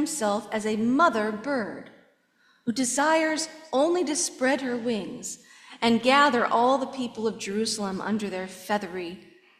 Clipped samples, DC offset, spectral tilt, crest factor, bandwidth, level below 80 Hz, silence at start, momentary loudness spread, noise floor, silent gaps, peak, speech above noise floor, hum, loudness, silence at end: under 0.1%; under 0.1%; -3 dB/octave; 20 dB; 15 kHz; -70 dBFS; 0 s; 14 LU; -64 dBFS; none; -6 dBFS; 39 dB; none; -25 LUFS; 0.4 s